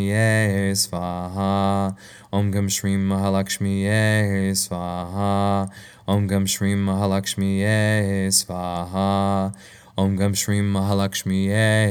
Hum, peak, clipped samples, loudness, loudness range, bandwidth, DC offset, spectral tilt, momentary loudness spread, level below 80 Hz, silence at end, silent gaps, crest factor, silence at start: none; -4 dBFS; under 0.1%; -21 LUFS; 1 LU; 18.5 kHz; under 0.1%; -5 dB/octave; 9 LU; -54 dBFS; 0 s; none; 16 dB; 0 s